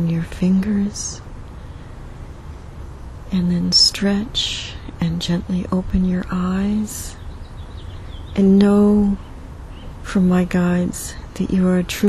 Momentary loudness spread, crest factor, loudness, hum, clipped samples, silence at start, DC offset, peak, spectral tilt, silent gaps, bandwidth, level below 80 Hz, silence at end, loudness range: 23 LU; 16 dB; -18 LUFS; none; under 0.1%; 0 s; under 0.1%; -2 dBFS; -5.5 dB/octave; none; 13.5 kHz; -34 dBFS; 0 s; 5 LU